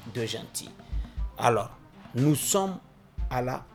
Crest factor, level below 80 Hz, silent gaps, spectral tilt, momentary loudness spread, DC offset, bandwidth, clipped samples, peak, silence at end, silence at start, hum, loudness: 24 dB; -40 dBFS; none; -4.5 dB/octave; 14 LU; under 0.1%; 19 kHz; under 0.1%; -6 dBFS; 0 s; 0 s; none; -29 LUFS